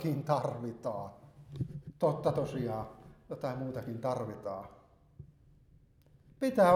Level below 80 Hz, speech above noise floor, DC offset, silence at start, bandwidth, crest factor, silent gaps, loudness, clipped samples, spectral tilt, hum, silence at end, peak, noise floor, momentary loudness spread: -64 dBFS; 31 dB; under 0.1%; 0 s; 16 kHz; 22 dB; none; -36 LUFS; under 0.1%; -7.5 dB/octave; none; 0 s; -12 dBFS; -63 dBFS; 23 LU